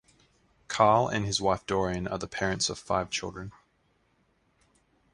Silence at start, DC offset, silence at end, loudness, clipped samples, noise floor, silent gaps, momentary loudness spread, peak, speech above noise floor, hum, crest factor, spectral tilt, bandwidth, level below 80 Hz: 0.7 s; under 0.1%; 1.65 s; -28 LUFS; under 0.1%; -70 dBFS; none; 14 LU; -6 dBFS; 42 dB; none; 24 dB; -4 dB/octave; 11.5 kHz; -54 dBFS